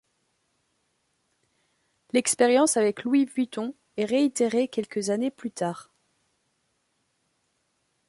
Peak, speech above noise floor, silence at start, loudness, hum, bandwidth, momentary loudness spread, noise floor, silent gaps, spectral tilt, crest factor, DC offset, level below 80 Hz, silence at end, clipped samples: -8 dBFS; 49 dB; 2.15 s; -25 LUFS; none; 12 kHz; 11 LU; -74 dBFS; none; -3.5 dB/octave; 20 dB; under 0.1%; -76 dBFS; 2.25 s; under 0.1%